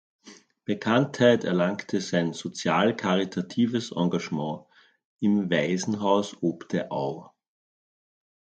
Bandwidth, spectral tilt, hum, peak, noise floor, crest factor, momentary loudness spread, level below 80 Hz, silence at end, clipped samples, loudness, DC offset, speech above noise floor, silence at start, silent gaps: 9 kHz; -5.5 dB/octave; none; -8 dBFS; under -90 dBFS; 20 dB; 10 LU; -68 dBFS; 1.3 s; under 0.1%; -26 LUFS; under 0.1%; over 65 dB; 0.25 s; 5.05-5.16 s